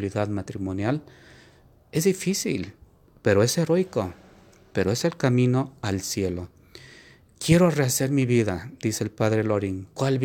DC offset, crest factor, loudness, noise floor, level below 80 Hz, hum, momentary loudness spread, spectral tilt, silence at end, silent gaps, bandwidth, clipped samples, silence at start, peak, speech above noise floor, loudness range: under 0.1%; 20 dB; -24 LUFS; -55 dBFS; -56 dBFS; none; 11 LU; -5.5 dB/octave; 0 s; none; 18 kHz; under 0.1%; 0 s; -6 dBFS; 31 dB; 3 LU